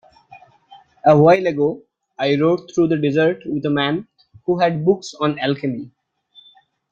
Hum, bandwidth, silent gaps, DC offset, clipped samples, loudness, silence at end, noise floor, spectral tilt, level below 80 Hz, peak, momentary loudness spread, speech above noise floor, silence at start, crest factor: none; 7.6 kHz; none; under 0.1%; under 0.1%; -18 LUFS; 1.05 s; -53 dBFS; -7 dB/octave; -60 dBFS; -2 dBFS; 13 LU; 36 dB; 0.3 s; 18 dB